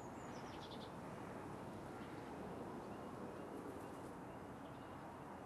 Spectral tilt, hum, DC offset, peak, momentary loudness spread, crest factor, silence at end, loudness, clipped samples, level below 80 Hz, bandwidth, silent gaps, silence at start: -6 dB/octave; none; under 0.1%; -38 dBFS; 3 LU; 14 dB; 0 s; -52 LUFS; under 0.1%; -70 dBFS; 12.5 kHz; none; 0 s